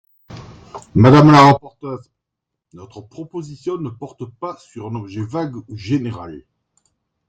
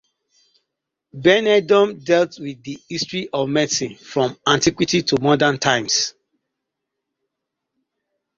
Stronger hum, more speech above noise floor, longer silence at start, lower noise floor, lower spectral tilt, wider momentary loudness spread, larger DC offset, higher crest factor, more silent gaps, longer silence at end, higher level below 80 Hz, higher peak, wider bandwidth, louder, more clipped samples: neither; about the same, 64 dB vs 62 dB; second, 0.3 s vs 1.15 s; about the same, -81 dBFS vs -80 dBFS; first, -7.5 dB/octave vs -3.5 dB/octave; first, 27 LU vs 10 LU; neither; about the same, 18 dB vs 20 dB; neither; second, 0.9 s vs 2.25 s; first, -50 dBFS vs -56 dBFS; about the same, 0 dBFS vs -2 dBFS; first, 8.8 kHz vs 7.6 kHz; first, -14 LUFS vs -18 LUFS; neither